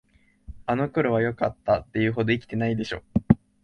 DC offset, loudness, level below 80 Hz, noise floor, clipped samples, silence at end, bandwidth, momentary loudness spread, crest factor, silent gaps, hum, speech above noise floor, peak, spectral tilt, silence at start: under 0.1%; -25 LUFS; -46 dBFS; -45 dBFS; under 0.1%; 0.25 s; 8.6 kHz; 6 LU; 24 dB; none; none; 21 dB; -2 dBFS; -8 dB/octave; 0.5 s